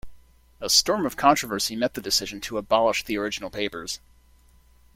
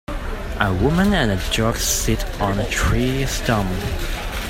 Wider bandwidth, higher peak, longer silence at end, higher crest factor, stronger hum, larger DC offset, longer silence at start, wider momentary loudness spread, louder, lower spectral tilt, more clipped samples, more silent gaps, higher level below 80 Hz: about the same, 16.5 kHz vs 16.5 kHz; second, -4 dBFS vs 0 dBFS; first, 1 s vs 0 s; about the same, 22 dB vs 18 dB; neither; neither; about the same, 0.05 s vs 0.1 s; first, 13 LU vs 9 LU; second, -23 LUFS vs -20 LUFS; second, -2 dB/octave vs -4.5 dB/octave; neither; neither; second, -52 dBFS vs -26 dBFS